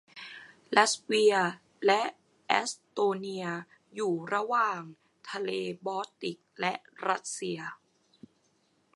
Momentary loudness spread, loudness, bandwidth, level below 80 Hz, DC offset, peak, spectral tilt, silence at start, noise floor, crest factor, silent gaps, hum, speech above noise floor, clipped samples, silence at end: 17 LU; -30 LUFS; 11.5 kHz; -84 dBFS; under 0.1%; -6 dBFS; -3 dB/octave; 0.15 s; -71 dBFS; 26 dB; none; none; 41 dB; under 0.1%; 1.2 s